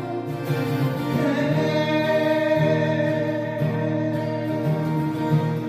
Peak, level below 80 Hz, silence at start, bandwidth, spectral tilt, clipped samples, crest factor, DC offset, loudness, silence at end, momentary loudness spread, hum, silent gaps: -8 dBFS; -58 dBFS; 0 s; 15 kHz; -7.5 dB/octave; under 0.1%; 14 dB; under 0.1%; -23 LUFS; 0 s; 5 LU; none; none